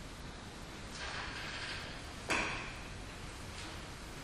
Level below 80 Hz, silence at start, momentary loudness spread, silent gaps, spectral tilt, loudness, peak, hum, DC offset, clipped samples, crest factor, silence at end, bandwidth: -52 dBFS; 0 s; 13 LU; none; -3 dB/octave; -42 LUFS; -20 dBFS; none; under 0.1%; under 0.1%; 22 dB; 0 s; 15.5 kHz